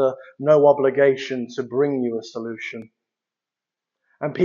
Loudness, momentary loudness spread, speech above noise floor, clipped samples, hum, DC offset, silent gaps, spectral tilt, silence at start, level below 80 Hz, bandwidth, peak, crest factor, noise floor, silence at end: -20 LUFS; 16 LU; 68 dB; under 0.1%; none; under 0.1%; none; -5.5 dB/octave; 0 s; -74 dBFS; 7.2 kHz; -2 dBFS; 18 dB; -88 dBFS; 0 s